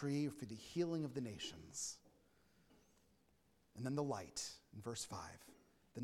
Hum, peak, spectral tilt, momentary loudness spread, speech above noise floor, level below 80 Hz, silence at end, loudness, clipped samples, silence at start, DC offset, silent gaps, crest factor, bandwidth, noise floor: none; -28 dBFS; -4.5 dB/octave; 16 LU; 32 dB; -76 dBFS; 0 s; -46 LUFS; under 0.1%; 0 s; under 0.1%; none; 20 dB; 16 kHz; -77 dBFS